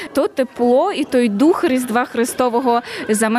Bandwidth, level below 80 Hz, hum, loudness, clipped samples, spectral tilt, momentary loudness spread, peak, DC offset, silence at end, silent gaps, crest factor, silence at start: 15 kHz; -58 dBFS; none; -17 LUFS; under 0.1%; -4.5 dB/octave; 5 LU; -4 dBFS; under 0.1%; 0 s; none; 12 dB; 0 s